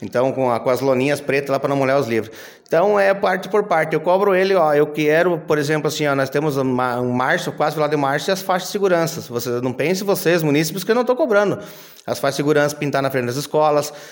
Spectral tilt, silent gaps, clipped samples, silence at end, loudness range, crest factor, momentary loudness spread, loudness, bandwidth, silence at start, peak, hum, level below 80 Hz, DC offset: -5 dB/octave; none; under 0.1%; 0 s; 2 LU; 14 dB; 6 LU; -18 LUFS; 17 kHz; 0 s; -4 dBFS; none; -64 dBFS; under 0.1%